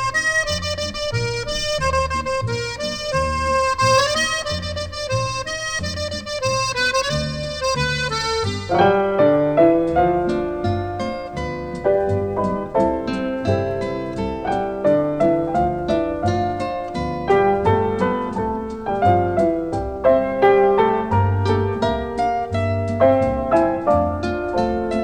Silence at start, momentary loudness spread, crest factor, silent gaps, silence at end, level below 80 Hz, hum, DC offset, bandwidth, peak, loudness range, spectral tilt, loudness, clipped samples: 0 s; 9 LU; 16 dB; none; 0 s; -38 dBFS; none; under 0.1%; 19 kHz; -4 dBFS; 4 LU; -5 dB/octave; -20 LUFS; under 0.1%